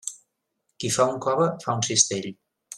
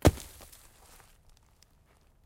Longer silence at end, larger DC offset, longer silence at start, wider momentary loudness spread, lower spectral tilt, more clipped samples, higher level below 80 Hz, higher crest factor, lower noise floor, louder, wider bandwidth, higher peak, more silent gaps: second, 0 s vs 2.05 s; neither; about the same, 0.05 s vs 0.05 s; second, 13 LU vs 21 LU; second, -3 dB/octave vs -6 dB/octave; neither; second, -66 dBFS vs -42 dBFS; second, 22 dB vs 30 dB; first, -77 dBFS vs -63 dBFS; first, -23 LUFS vs -32 LUFS; second, 14 kHz vs 17 kHz; about the same, -4 dBFS vs -4 dBFS; neither